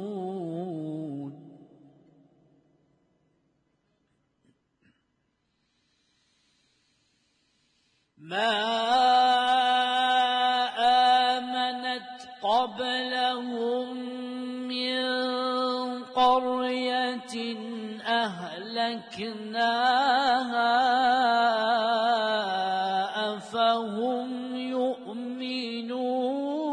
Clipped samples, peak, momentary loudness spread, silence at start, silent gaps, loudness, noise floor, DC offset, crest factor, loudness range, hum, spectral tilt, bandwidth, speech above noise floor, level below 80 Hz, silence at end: under 0.1%; -10 dBFS; 12 LU; 0 s; none; -26 LUFS; -75 dBFS; under 0.1%; 18 dB; 7 LU; none; -4 dB/octave; 10.5 kHz; 48 dB; -74 dBFS; 0 s